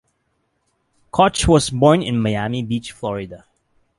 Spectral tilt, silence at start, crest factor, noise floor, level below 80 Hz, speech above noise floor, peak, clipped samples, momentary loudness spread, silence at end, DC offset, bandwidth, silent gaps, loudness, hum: -5.5 dB/octave; 1.15 s; 18 dB; -69 dBFS; -36 dBFS; 51 dB; -2 dBFS; under 0.1%; 12 LU; 0.6 s; under 0.1%; 11.5 kHz; none; -18 LUFS; none